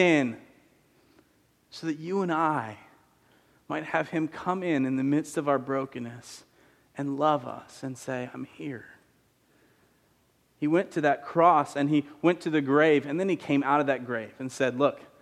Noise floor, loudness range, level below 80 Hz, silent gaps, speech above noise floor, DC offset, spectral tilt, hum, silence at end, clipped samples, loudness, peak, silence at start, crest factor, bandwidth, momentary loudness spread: -67 dBFS; 9 LU; -74 dBFS; none; 40 dB; under 0.1%; -6 dB/octave; none; 0.15 s; under 0.1%; -27 LUFS; -8 dBFS; 0 s; 20 dB; 12.5 kHz; 17 LU